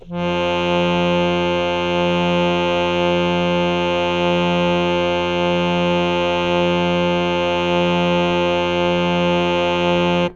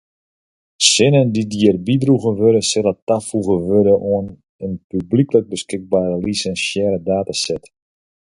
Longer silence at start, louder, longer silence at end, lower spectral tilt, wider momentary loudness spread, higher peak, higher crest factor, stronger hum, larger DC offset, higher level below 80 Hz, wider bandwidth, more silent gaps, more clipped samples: second, 0.05 s vs 0.8 s; about the same, -18 LUFS vs -16 LUFS; second, 0 s vs 0.8 s; first, -6 dB/octave vs -4.5 dB/octave; second, 1 LU vs 12 LU; second, -4 dBFS vs 0 dBFS; about the same, 14 dB vs 18 dB; neither; neither; about the same, -44 dBFS vs -48 dBFS; second, 7.4 kHz vs 11.5 kHz; second, none vs 3.02-3.07 s, 4.49-4.59 s, 4.84-4.90 s; neither